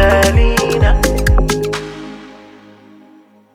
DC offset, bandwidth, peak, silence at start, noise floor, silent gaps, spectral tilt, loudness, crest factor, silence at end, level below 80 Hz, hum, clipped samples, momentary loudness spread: under 0.1%; 16 kHz; 0 dBFS; 0 s; -45 dBFS; none; -5 dB/octave; -14 LUFS; 14 dB; 1.2 s; -18 dBFS; none; under 0.1%; 19 LU